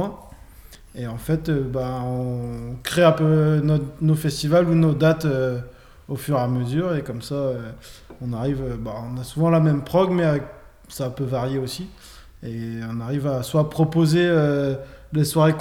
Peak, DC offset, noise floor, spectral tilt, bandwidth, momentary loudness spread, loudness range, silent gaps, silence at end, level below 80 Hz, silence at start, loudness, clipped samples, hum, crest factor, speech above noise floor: -2 dBFS; under 0.1%; -45 dBFS; -7 dB/octave; 16 kHz; 15 LU; 7 LU; none; 0 s; -46 dBFS; 0 s; -22 LUFS; under 0.1%; none; 18 dB; 24 dB